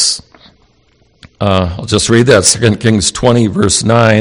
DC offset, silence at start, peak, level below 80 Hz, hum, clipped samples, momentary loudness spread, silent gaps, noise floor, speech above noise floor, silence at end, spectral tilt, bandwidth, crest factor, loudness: under 0.1%; 0 s; 0 dBFS; -36 dBFS; none; 0.9%; 7 LU; none; -52 dBFS; 42 dB; 0 s; -4 dB/octave; over 20 kHz; 12 dB; -10 LUFS